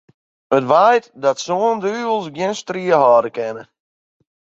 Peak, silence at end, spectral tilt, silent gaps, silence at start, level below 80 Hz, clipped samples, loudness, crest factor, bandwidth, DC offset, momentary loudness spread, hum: 0 dBFS; 0.95 s; -4.5 dB/octave; none; 0.5 s; -68 dBFS; under 0.1%; -17 LUFS; 18 dB; 7.8 kHz; under 0.1%; 11 LU; none